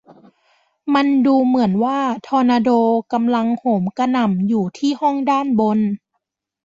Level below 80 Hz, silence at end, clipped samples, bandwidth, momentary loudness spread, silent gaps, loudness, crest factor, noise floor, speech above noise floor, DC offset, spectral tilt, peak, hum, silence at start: -62 dBFS; 0.7 s; under 0.1%; 7.8 kHz; 5 LU; none; -17 LUFS; 14 dB; -75 dBFS; 58 dB; under 0.1%; -7 dB/octave; -4 dBFS; none; 0.85 s